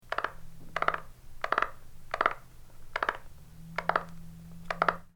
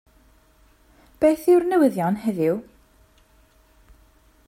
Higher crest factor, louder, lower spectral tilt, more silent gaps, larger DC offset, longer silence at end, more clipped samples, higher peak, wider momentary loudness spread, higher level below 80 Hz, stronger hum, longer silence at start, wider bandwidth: first, 28 dB vs 18 dB; second, -33 LUFS vs -21 LUFS; second, -4.5 dB/octave vs -7.5 dB/octave; neither; neither; second, 0.05 s vs 1.85 s; neither; about the same, -6 dBFS vs -6 dBFS; first, 18 LU vs 7 LU; first, -50 dBFS vs -56 dBFS; neither; second, 0.05 s vs 1.2 s; first, 20 kHz vs 16 kHz